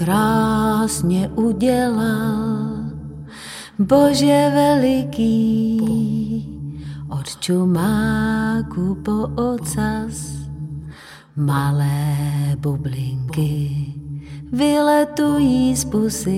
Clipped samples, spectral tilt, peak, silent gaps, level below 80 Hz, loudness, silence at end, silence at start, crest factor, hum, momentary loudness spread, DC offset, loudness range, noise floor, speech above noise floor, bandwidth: under 0.1%; -6 dB/octave; -2 dBFS; none; -40 dBFS; -19 LUFS; 0 s; 0 s; 16 dB; none; 16 LU; under 0.1%; 5 LU; -39 dBFS; 21 dB; 16 kHz